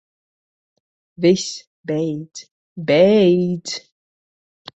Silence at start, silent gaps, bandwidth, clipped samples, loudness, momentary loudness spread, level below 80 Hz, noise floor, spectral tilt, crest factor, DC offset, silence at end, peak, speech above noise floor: 1.2 s; 1.67-1.84 s, 2.51-2.76 s; 8.2 kHz; under 0.1%; -18 LUFS; 20 LU; -62 dBFS; under -90 dBFS; -5.5 dB/octave; 18 dB; under 0.1%; 1 s; -2 dBFS; over 73 dB